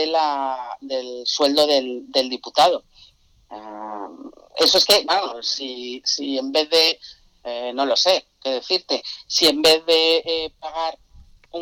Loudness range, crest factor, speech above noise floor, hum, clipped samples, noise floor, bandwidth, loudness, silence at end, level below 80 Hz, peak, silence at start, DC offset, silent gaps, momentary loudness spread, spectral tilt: 3 LU; 16 dB; 33 dB; none; under 0.1%; -53 dBFS; 19 kHz; -19 LUFS; 0 s; -58 dBFS; -6 dBFS; 0 s; under 0.1%; none; 17 LU; -1 dB/octave